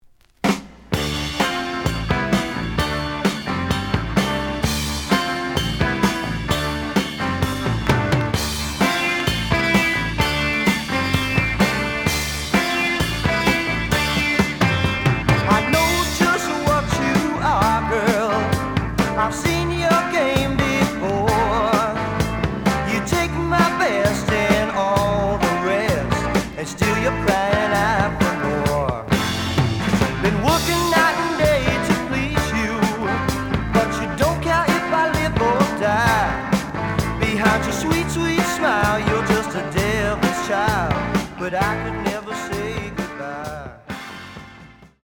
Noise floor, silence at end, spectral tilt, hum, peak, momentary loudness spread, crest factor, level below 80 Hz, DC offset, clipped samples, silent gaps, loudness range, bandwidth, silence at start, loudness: -44 dBFS; 0.15 s; -5 dB/octave; none; -2 dBFS; 6 LU; 18 dB; -34 dBFS; under 0.1%; under 0.1%; none; 4 LU; over 20 kHz; 0.45 s; -20 LUFS